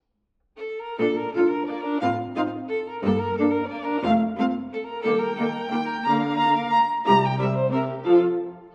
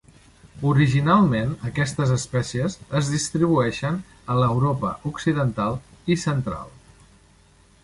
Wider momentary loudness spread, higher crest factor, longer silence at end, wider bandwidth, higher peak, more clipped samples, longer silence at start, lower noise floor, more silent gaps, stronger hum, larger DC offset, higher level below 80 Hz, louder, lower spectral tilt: about the same, 10 LU vs 10 LU; about the same, 18 dB vs 18 dB; second, 0.05 s vs 1.15 s; second, 7.4 kHz vs 11.5 kHz; about the same, -6 dBFS vs -4 dBFS; neither; about the same, 0.55 s vs 0.55 s; first, -72 dBFS vs -55 dBFS; neither; neither; neither; second, -62 dBFS vs -48 dBFS; about the same, -23 LUFS vs -23 LUFS; first, -8 dB/octave vs -6 dB/octave